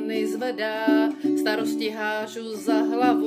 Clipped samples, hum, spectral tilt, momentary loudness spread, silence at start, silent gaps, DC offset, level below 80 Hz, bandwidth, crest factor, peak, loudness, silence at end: under 0.1%; none; -4 dB/octave; 7 LU; 0 s; none; under 0.1%; -82 dBFS; 16 kHz; 16 dB; -8 dBFS; -24 LUFS; 0 s